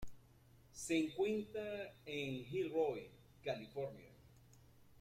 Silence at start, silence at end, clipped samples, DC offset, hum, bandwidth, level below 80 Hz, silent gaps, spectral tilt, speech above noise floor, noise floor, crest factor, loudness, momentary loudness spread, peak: 0 s; 0 s; under 0.1%; under 0.1%; none; 15.5 kHz; -68 dBFS; none; -5 dB/octave; 25 dB; -66 dBFS; 18 dB; -42 LUFS; 20 LU; -26 dBFS